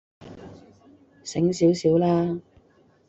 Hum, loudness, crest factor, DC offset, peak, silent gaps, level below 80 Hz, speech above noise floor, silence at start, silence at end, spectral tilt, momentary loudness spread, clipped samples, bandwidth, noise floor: none; -23 LUFS; 16 dB; under 0.1%; -8 dBFS; none; -60 dBFS; 38 dB; 0.25 s; 0.7 s; -7 dB/octave; 23 LU; under 0.1%; 8 kHz; -59 dBFS